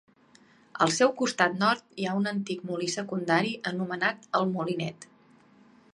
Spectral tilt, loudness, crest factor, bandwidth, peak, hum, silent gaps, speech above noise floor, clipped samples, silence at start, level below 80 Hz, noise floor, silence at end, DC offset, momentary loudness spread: -4.5 dB/octave; -28 LUFS; 22 dB; 11.5 kHz; -6 dBFS; none; none; 32 dB; under 0.1%; 0.75 s; -74 dBFS; -59 dBFS; 0.9 s; under 0.1%; 9 LU